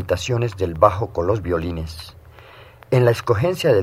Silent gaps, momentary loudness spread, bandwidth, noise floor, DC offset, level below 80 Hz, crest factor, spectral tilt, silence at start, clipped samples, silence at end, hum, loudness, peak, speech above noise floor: none; 13 LU; 15.5 kHz; -44 dBFS; under 0.1%; -44 dBFS; 20 dB; -6.5 dB/octave; 0 s; under 0.1%; 0 s; none; -20 LUFS; 0 dBFS; 25 dB